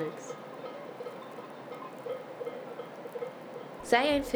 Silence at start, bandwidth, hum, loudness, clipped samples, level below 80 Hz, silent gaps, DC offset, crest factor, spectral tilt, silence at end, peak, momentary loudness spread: 0 s; over 20 kHz; none; -36 LUFS; under 0.1%; -62 dBFS; none; under 0.1%; 24 dB; -4 dB/octave; 0 s; -10 dBFS; 17 LU